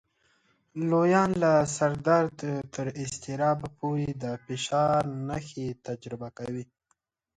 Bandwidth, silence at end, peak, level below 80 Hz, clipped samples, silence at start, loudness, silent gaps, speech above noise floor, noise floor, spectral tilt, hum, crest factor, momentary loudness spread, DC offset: 10.5 kHz; 0.75 s; -8 dBFS; -60 dBFS; under 0.1%; 0.75 s; -28 LUFS; none; 48 dB; -75 dBFS; -6 dB/octave; none; 20 dB; 14 LU; under 0.1%